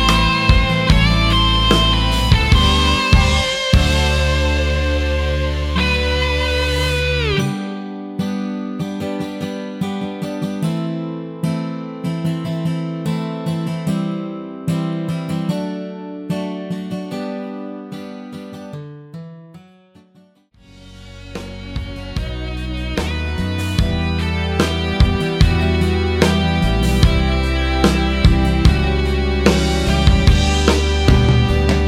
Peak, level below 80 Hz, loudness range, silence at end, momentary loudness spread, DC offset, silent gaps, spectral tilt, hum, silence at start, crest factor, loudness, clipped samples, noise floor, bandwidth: 0 dBFS; -22 dBFS; 16 LU; 0 s; 14 LU; under 0.1%; none; -5.5 dB/octave; none; 0 s; 16 dB; -17 LUFS; under 0.1%; -51 dBFS; 14.5 kHz